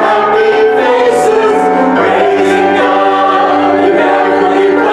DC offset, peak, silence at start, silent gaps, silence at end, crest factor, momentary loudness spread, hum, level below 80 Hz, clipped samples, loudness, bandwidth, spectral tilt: under 0.1%; 0 dBFS; 0 s; none; 0 s; 8 dB; 1 LU; none; -50 dBFS; under 0.1%; -9 LUFS; 12 kHz; -5 dB/octave